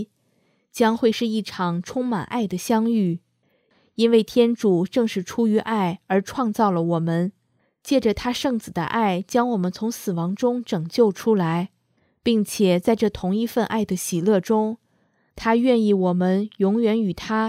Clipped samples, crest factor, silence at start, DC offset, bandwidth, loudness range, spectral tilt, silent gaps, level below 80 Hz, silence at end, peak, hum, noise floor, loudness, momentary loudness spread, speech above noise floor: under 0.1%; 18 dB; 0 s; under 0.1%; 16 kHz; 2 LU; -6 dB/octave; none; -54 dBFS; 0 s; -4 dBFS; none; -66 dBFS; -22 LUFS; 7 LU; 45 dB